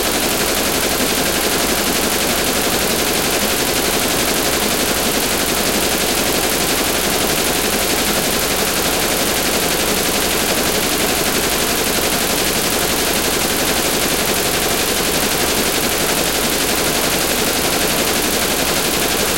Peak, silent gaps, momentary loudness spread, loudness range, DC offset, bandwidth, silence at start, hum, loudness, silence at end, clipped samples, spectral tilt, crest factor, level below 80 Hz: -2 dBFS; none; 0 LU; 0 LU; under 0.1%; 17.5 kHz; 0 s; none; -15 LUFS; 0 s; under 0.1%; -2 dB/octave; 14 dB; -34 dBFS